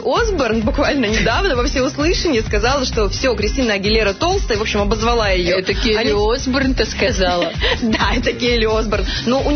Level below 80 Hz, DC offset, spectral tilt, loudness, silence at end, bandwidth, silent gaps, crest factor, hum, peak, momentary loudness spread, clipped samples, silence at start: -24 dBFS; under 0.1%; -4.5 dB/octave; -16 LUFS; 0 s; 6.6 kHz; none; 12 dB; none; -4 dBFS; 2 LU; under 0.1%; 0 s